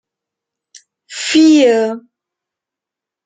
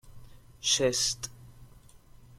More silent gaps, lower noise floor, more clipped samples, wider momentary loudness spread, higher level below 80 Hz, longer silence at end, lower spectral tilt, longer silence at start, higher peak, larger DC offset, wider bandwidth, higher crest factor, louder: neither; first, -85 dBFS vs -54 dBFS; neither; first, 21 LU vs 13 LU; second, -66 dBFS vs -56 dBFS; first, 1.25 s vs 0.4 s; first, -3 dB/octave vs -1.5 dB/octave; first, 1.1 s vs 0.05 s; first, -2 dBFS vs -12 dBFS; neither; second, 9.4 kHz vs 16.5 kHz; second, 14 dB vs 20 dB; first, -12 LUFS vs -27 LUFS